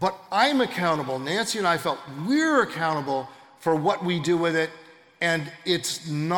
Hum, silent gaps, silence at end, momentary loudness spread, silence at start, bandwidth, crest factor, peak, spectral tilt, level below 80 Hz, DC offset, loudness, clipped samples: none; none; 0 s; 8 LU; 0 s; 18 kHz; 18 dB; -8 dBFS; -4.5 dB/octave; -70 dBFS; under 0.1%; -25 LUFS; under 0.1%